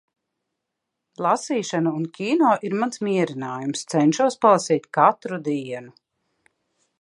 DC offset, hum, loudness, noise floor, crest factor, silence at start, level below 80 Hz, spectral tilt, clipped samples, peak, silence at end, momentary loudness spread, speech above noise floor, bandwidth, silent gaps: under 0.1%; none; -22 LUFS; -81 dBFS; 20 dB; 1.2 s; -76 dBFS; -5.5 dB/octave; under 0.1%; -2 dBFS; 1.1 s; 10 LU; 60 dB; 11.5 kHz; none